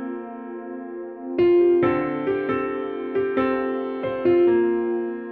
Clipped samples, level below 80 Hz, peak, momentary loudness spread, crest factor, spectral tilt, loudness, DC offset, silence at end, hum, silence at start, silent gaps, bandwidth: under 0.1%; -58 dBFS; -8 dBFS; 16 LU; 14 dB; -9.5 dB/octave; -22 LUFS; under 0.1%; 0 s; none; 0 s; none; 4.6 kHz